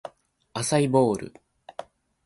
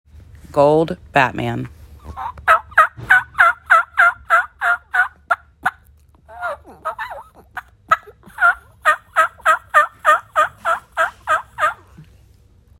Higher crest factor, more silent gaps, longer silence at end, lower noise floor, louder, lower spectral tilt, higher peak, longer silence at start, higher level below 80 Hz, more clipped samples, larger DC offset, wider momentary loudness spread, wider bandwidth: about the same, 20 dB vs 18 dB; neither; second, 0.45 s vs 0.75 s; about the same, -48 dBFS vs -50 dBFS; second, -24 LUFS vs -17 LUFS; about the same, -5.5 dB/octave vs -4.5 dB/octave; second, -8 dBFS vs 0 dBFS; second, 0.05 s vs 0.5 s; second, -62 dBFS vs -48 dBFS; neither; neither; first, 21 LU vs 16 LU; second, 12 kHz vs 16 kHz